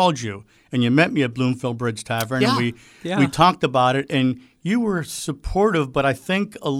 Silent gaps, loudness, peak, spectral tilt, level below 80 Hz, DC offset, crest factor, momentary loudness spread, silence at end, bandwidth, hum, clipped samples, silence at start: none; -21 LUFS; -4 dBFS; -5.5 dB/octave; -44 dBFS; under 0.1%; 18 dB; 11 LU; 0 s; 18 kHz; none; under 0.1%; 0 s